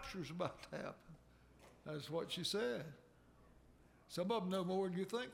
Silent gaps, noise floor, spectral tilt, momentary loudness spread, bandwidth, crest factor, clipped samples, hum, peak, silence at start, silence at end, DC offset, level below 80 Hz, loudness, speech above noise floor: none; -67 dBFS; -5 dB/octave; 18 LU; 16.5 kHz; 20 dB; under 0.1%; 60 Hz at -70 dBFS; -26 dBFS; 0 s; 0 s; under 0.1%; -70 dBFS; -43 LUFS; 24 dB